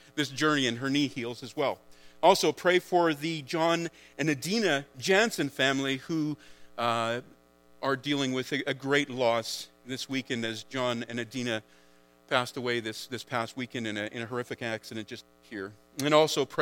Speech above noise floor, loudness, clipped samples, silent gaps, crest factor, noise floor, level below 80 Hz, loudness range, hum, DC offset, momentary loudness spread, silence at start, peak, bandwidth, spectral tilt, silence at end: 31 dB; -29 LUFS; under 0.1%; none; 24 dB; -60 dBFS; -72 dBFS; 6 LU; none; under 0.1%; 13 LU; 0.15 s; -6 dBFS; 17.5 kHz; -4 dB/octave; 0 s